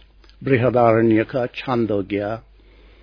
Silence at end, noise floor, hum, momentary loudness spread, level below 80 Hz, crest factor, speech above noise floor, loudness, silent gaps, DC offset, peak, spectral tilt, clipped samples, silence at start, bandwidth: 0.65 s; -48 dBFS; none; 12 LU; -50 dBFS; 18 dB; 30 dB; -19 LUFS; none; under 0.1%; -2 dBFS; -9.5 dB/octave; under 0.1%; 0.4 s; 5.4 kHz